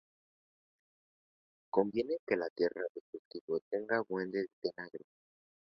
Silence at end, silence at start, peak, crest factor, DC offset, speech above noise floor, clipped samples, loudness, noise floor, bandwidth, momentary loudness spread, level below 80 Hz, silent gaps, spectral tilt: 0.8 s; 1.75 s; -14 dBFS; 24 dB; under 0.1%; over 54 dB; under 0.1%; -36 LUFS; under -90 dBFS; 6 kHz; 15 LU; -78 dBFS; 2.19-2.27 s, 2.50-2.56 s, 2.89-3.13 s, 3.19-3.31 s, 3.41-3.48 s, 3.62-3.71 s, 4.53-4.62 s; -4 dB/octave